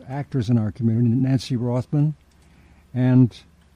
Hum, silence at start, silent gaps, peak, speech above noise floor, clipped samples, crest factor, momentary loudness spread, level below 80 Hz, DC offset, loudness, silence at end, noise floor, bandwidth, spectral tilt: none; 0.05 s; none; -6 dBFS; 33 dB; under 0.1%; 16 dB; 9 LU; -54 dBFS; under 0.1%; -21 LUFS; 0.35 s; -52 dBFS; 10 kHz; -8.5 dB/octave